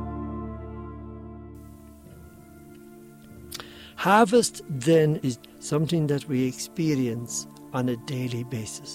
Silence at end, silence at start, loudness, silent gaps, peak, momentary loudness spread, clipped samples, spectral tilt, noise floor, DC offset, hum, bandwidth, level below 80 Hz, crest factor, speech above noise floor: 0 s; 0 s; -25 LUFS; none; -6 dBFS; 22 LU; under 0.1%; -5.5 dB/octave; -47 dBFS; under 0.1%; none; 16 kHz; -50 dBFS; 22 dB; 23 dB